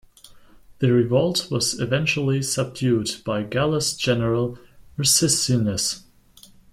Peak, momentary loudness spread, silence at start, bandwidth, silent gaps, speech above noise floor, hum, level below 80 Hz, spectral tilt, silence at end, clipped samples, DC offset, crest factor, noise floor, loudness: -4 dBFS; 8 LU; 0.35 s; 16 kHz; none; 29 dB; none; -52 dBFS; -4 dB/octave; 0.75 s; under 0.1%; under 0.1%; 18 dB; -51 dBFS; -21 LUFS